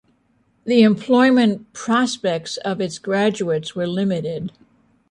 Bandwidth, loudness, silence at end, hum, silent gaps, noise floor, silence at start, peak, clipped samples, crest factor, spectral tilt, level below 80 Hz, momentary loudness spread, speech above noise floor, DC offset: 11 kHz; -19 LUFS; 0.6 s; none; none; -62 dBFS; 0.65 s; -4 dBFS; under 0.1%; 16 dB; -5.5 dB/octave; -62 dBFS; 13 LU; 44 dB; under 0.1%